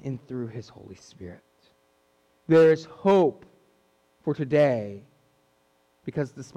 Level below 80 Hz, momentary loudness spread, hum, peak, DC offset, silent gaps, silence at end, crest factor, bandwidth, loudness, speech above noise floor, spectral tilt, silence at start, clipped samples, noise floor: -68 dBFS; 26 LU; none; -12 dBFS; under 0.1%; none; 0.1 s; 16 dB; 8.6 kHz; -24 LUFS; 42 dB; -7.5 dB/octave; 0.05 s; under 0.1%; -66 dBFS